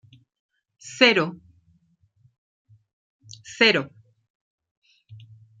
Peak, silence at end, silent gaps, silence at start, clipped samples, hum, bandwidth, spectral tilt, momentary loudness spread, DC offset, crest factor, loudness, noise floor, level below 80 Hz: -2 dBFS; 0.45 s; 2.38-2.65 s, 2.93-3.19 s, 4.30-4.58 s, 4.71-4.82 s; 0.85 s; under 0.1%; none; 9.4 kHz; -3.5 dB/octave; 25 LU; under 0.1%; 26 dB; -19 LUFS; -64 dBFS; -72 dBFS